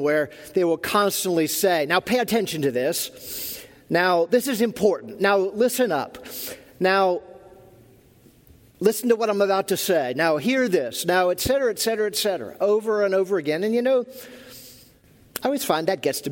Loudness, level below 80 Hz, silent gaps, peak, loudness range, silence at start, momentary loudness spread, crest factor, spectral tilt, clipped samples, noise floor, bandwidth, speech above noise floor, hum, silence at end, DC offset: -22 LUFS; -56 dBFS; none; -4 dBFS; 3 LU; 0 s; 10 LU; 18 dB; -3.5 dB/octave; under 0.1%; -54 dBFS; 17 kHz; 32 dB; none; 0 s; under 0.1%